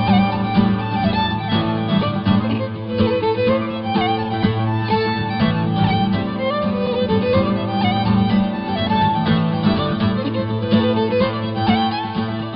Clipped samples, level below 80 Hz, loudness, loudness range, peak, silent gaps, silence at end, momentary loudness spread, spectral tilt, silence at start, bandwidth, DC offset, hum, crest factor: under 0.1%; -42 dBFS; -19 LUFS; 1 LU; -2 dBFS; none; 0 s; 4 LU; -11.5 dB/octave; 0 s; 5.4 kHz; under 0.1%; none; 14 dB